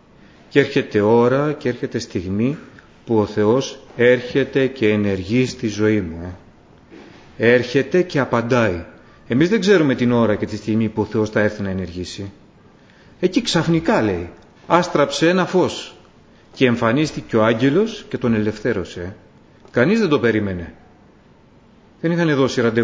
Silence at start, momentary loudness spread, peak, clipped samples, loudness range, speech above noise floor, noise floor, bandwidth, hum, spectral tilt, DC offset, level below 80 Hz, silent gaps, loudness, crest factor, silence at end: 0.55 s; 12 LU; 0 dBFS; under 0.1%; 4 LU; 32 dB; -50 dBFS; 8 kHz; none; -6 dB/octave; under 0.1%; -46 dBFS; none; -18 LUFS; 18 dB; 0 s